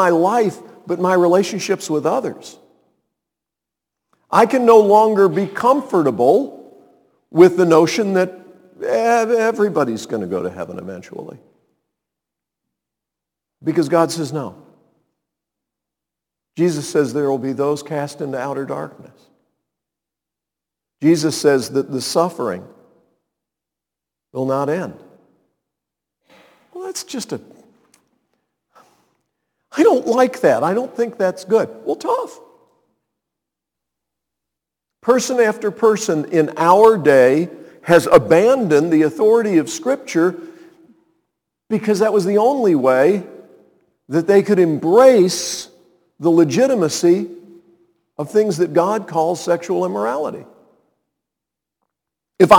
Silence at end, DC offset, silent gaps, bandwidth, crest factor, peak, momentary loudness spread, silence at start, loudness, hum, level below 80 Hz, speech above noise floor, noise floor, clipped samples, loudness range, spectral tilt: 0 s; under 0.1%; none; 19 kHz; 18 dB; 0 dBFS; 16 LU; 0 s; -16 LUFS; none; -62 dBFS; 70 dB; -86 dBFS; under 0.1%; 13 LU; -5.5 dB/octave